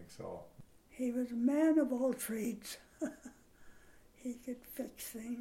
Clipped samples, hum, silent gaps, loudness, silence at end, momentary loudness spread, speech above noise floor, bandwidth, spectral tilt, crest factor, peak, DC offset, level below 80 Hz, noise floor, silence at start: under 0.1%; none; none; -37 LUFS; 0 s; 17 LU; 24 dB; 16.5 kHz; -5 dB/octave; 18 dB; -20 dBFS; under 0.1%; -68 dBFS; -61 dBFS; 0 s